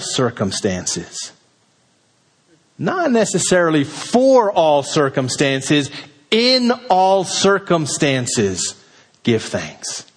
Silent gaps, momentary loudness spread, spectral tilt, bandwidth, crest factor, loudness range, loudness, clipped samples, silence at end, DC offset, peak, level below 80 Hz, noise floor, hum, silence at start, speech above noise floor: none; 12 LU; -4 dB/octave; 10.5 kHz; 16 dB; 5 LU; -17 LUFS; under 0.1%; 0.15 s; under 0.1%; -2 dBFS; -56 dBFS; -59 dBFS; none; 0 s; 42 dB